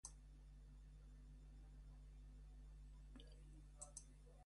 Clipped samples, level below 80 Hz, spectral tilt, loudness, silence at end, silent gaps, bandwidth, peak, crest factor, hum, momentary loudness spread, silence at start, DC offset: under 0.1%; -62 dBFS; -4 dB/octave; -63 LUFS; 0 s; none; 11.5 kHz; -36 dBFS; 24 dB; 50 Hz at -60 dBFS; 7 LU; 0.05 s; under 0.1%